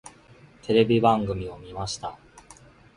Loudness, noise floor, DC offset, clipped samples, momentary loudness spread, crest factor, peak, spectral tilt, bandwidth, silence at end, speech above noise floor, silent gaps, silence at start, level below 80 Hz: -24 LUFS; -52 dBFS; under 0.1%; under 0.1%; 17 LU; 22 dB; -6 dBFS; -6 dB/octave; 11.5 kHz; 0.8 s; 29 dB; none; 0.05 s; -50 dBFS